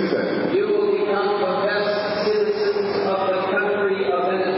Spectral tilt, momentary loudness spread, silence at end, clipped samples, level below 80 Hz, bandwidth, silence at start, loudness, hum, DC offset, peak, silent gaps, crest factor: -9.5 dB/octave; 2 LU; 0 s; under 0.1%; -64 dBFS; 5.8 kHz; 0 s; -21 LUFS; none; under 0.1%; -8 dBFS; none; 12 dB